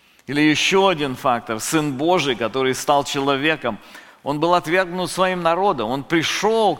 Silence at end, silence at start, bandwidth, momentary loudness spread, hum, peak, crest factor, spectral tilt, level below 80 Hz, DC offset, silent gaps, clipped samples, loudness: 0 s; 0.3 s; 17 kHz; 8 LU; none; -2 dBFS; 18 dB; -4 dB/octave; -52 dBFS; under 0.1%; none; under 0.1%; -19 LUFS